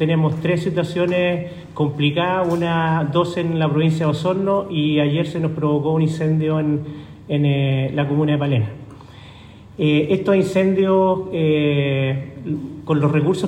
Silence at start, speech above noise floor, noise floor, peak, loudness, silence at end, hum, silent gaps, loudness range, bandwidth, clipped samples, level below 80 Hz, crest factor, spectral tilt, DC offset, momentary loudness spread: 0 s; 23 dB; -41 dBFS; -4 dBFS; -19 LUFS; 0 s; none; none; 2 LU; 9.8 kHz; under 0.1%; -52 dBFS; 14 dB; -8 dB/octave; under 0.1%; 9 LU